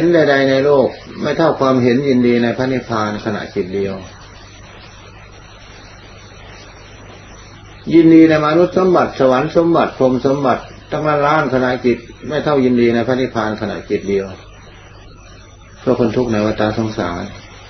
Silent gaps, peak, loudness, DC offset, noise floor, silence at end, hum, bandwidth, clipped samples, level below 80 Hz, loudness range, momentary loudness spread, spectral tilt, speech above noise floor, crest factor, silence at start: none; 0 dBFS; -15 LUFS; under 0.1%; -39 dBFS; 0 s; none; 6.4 kHz; under 0.1%; -44 dBFS; 10 LU; 12 LU; -7 dB/octave; 25 dB; 16 dB; 0 s